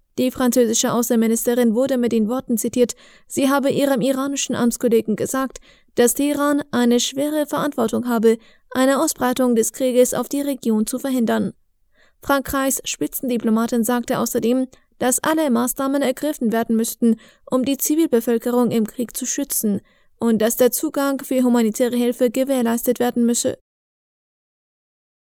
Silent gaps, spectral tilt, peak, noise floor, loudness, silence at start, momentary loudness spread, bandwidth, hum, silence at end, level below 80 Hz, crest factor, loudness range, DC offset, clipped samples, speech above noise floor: none; -4 dB/octave; -4 dBFS; -57 dBFS; -19 LUFS; 0.15 s; 6 LU; over 20 kHz; none; 1.7 s; -54 dBFS; 16 dB; 2 LU; under 0.1%; under 0.1%; 38 dB